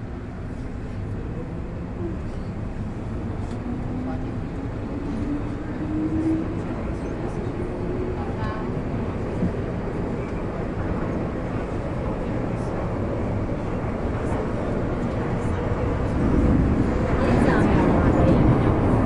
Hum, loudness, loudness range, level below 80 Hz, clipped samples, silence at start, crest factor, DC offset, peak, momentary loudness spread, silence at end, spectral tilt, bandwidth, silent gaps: none; -25 LUFS; 9 LU; -32 dBFS; under 0.1%; 0 s; 18 dB; under 0.1%; -6 dBFS; 12 LU; 0 s; -9 dB/octave; 11 kHz; none